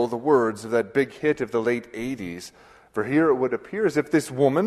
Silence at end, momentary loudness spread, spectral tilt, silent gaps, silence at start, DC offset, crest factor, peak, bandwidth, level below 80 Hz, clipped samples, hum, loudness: 0 s; 12 LU; -6.5 dB/octave; none; 0 s; under 0.1%; 16 dB; -6 dBFS; 13 kHz; -60 dBFS; under 0.1%; none; -24 LUFS